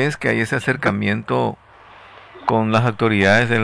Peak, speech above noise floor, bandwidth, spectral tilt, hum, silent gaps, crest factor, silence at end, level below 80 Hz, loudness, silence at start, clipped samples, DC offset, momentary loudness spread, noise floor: -4 dBFS; 26 dB; 11 kHz; -6.5 dB/octave; none; none; 16 dB; 0 s; -54 dBFS; -18 LUFS; 0 s; under 0.1%; under 0.1%; 8 LU; -44 dBFS